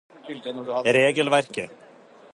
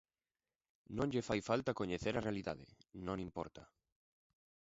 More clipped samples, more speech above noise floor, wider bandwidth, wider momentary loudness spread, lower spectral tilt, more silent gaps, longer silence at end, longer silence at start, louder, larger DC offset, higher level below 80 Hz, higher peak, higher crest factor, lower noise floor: neither; second, 27 dB vs over 49 dB; first, 11.5 kHz vs 7.6 kHz; first, 18 LU vs 14 LU; second, -4 dB/octave vs -5.5 dB/octave; neither; second, 0.6 s vs 1 s; second, 0.25 s vs 0.9 s; first, -22 LUFS vs -41 LUFS; neither; second, -72 dBFS vs -64 dBFS; first, -6 dBFS vs -20 dBFS; about the same, 18 dB vs 22 dB; second, -50 dBFS vs under -90 dBFS